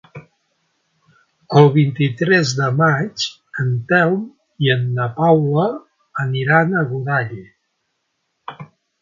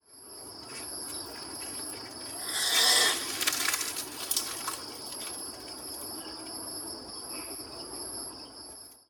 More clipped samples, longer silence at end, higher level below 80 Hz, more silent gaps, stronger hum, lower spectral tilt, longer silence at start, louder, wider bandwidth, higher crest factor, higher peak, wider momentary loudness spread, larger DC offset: neither; first, 0.35 s vs 0.1 s; first, -60 dBFS vs -66 dBFS; neither; neither; first, -6.5 dB/octave vs 0.5 dB/octave; about the same, 0.15 s vs 0.1 s; first, -17 LUFS vs -31 LUFS; second, 7.6 kHz vs over 20 kHz; second, 18 dB vs 26 dB; first, 0 dBFS vs -8 dBFS; about the same, 18 LU vs 17 LU; neither